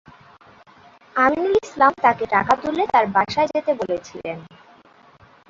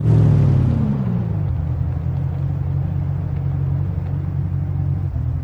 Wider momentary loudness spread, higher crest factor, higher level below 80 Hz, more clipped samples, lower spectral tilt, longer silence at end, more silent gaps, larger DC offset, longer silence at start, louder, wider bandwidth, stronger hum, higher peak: first, 13 LU vs 8 LU; first, 20 dB vs 14 dB; second, -56 dBFS vs -30 dBFS; neither; second, -5 dB/octave vs -11 dB/octave; first, 1.05 s vs 0 s; neither; neither; first, 1.15 s vs 0 s; about the same, -19 LUFS vs -20 LUFS; first, 7.8 kHz vs 4 kHz; neither; first, -2 dBFS vs -6 dBFS